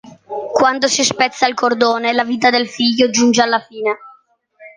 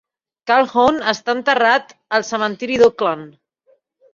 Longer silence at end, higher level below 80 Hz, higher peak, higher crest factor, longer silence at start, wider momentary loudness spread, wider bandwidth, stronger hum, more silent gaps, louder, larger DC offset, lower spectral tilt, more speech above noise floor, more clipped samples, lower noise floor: second, 0.1 s vs 0.85 s; about the same, -62 dBFS vs -58 dBFS; about the same, -2 dBFS vs -2 dBFS; about the same, 16 dB vs 16 dB; second, 0.05 s vs 0.45 s; about the same, 9 LU vs 7 LU; first, 10 kHz vs 7.6 kHz; neither; neither; about the same, -15 LUFS vs -17 LUFS; neither; second, -2 dB/octave vs -3.5 dB/octave; second, 37 dB vs 43 dB; neither; second, -52 dBFS vs -59 dBFS